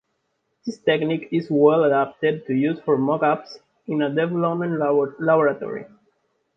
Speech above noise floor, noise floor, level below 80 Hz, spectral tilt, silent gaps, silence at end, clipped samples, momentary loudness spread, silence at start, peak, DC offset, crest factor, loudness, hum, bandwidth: 52 dB; -73 dBFS; -68 dBFS; -8 dB/octave; none; 0.7 s; under 0.1%; 12 LU; 0.65 s; -4 dBFS; under 0.1%; 18 dB; -21 LUFS; none; 6.2 kHz